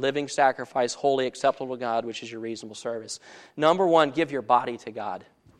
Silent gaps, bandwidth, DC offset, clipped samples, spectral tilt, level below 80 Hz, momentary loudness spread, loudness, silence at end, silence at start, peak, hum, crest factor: none; 11.5 kHz; under 0.1%; under 0.1%; -4 dB/octave; -74 dBFS; 14 LU; -26 LUFS; 0.35 s; 0 s; -6 dBFS; none; 20 dB